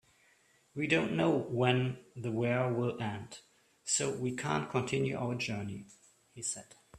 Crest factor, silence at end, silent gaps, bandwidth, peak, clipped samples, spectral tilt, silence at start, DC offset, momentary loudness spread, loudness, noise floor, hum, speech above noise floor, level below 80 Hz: 22 dB; 0 s; none; 12.5 kHz; -12 dBFS; under 0.1%; -4.5 dB/octave; 0.75 s; under 0.1%; 14 LU; -33 LUFS; -68 dBFS; none; 35 dB; -70 dBFS